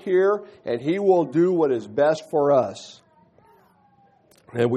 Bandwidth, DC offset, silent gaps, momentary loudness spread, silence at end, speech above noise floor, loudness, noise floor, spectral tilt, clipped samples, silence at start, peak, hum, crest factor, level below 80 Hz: 8.8 kHz; under 0.1%; none; 11 LU; 0 s; 37 dB; -21 LUFS; -58 dBFS; -7 dB/octave; under 0.1%; 0.05 s; -8 dBFS; none; 16 dB; -70 dBFS